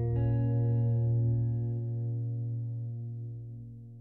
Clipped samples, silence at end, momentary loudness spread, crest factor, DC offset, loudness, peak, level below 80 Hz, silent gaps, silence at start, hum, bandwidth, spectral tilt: under 0.1%; 0 s; 14 LU; 10 dB; under 0.1%; -32 LUFS; -20 dBFS; -52 dBFS; none; 0 s; none; 2 kHz; -13.5 dB/octave